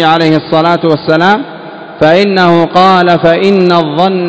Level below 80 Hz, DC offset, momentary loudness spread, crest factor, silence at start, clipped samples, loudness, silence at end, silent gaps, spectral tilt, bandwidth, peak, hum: -48 dBFS; under 0.1%; 6 LU; 8 dB; 0 s; 3%; -8 LUFS; 0 s; none; -7 dB/octave; 8 kHz; 0 dBFS; none